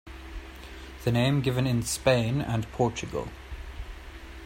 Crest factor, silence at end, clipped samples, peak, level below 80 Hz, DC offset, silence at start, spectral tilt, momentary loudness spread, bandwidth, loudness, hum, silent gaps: 22 dB; 0 s; under 0.1%; -8 dBFS; -44 dBFS; under 0.1%; 0.05 s; -5.5 dB/octave; 19 LU; 16 kHz; -27 LUFS; none; none